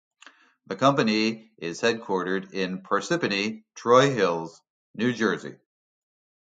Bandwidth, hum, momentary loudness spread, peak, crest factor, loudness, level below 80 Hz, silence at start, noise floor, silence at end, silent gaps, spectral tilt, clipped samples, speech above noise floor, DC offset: 9.2 kHz; none; 15 LU; -6 dBFS; 22 dB; -25 LUFS; -70 dBFS; 0.7 s; -55 dBFS; 0.95 s; 4.70-4.94 s; -5 dB/octave; under 0.1%; 30 dB; under 0.1%